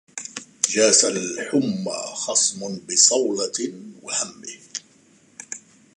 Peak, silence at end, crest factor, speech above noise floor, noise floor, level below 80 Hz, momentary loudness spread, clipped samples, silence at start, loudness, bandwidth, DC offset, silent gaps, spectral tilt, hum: 0 dBFS; 0.4 s; 24 dB; 34 dB; -56 dBFS; -74 dBFS; 20 LU; under 0.1%; 0.15 s; -20 LUFS; 11.5 kHz; under 0.1%; none; -1.5 dB/octave; none